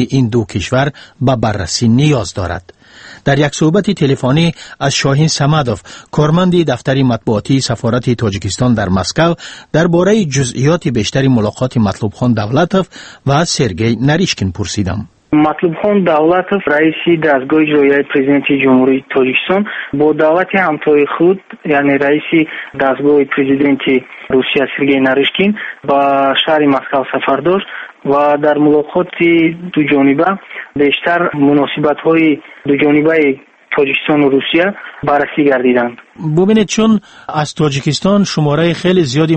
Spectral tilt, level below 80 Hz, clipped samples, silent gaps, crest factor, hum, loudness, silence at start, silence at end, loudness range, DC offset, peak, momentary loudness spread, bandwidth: -5.5 dB/octave; -42 dBFS; under 0.1%; none; 12 dB; none; -12 LUFS; 0 s; 0 s; 2 LU; under 0.1%; 0 dBFS; 6 LU; 8.8 kHz